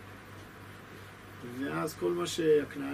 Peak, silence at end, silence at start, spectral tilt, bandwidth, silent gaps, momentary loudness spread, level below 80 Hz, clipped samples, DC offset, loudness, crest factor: -16 dBFS; 0 s; 0 s; -5 dB/octave; 15 kHz; none; 21 LU; -64 dBFS; under 0.1%; under 0.1%; -31 LUFS; 18 dB